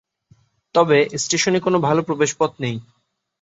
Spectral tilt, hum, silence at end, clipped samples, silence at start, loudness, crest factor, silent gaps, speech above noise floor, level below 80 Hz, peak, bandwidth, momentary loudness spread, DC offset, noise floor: -4 dB/octave; none; 0.6 s; under 0.1%; 0.75 s; -19 LUFS; 18 dB; none; 38 dB; -60 dBFS; -2 dBFS; 8.2 kHz; 10 LU; under 0.1%; -57 dBFS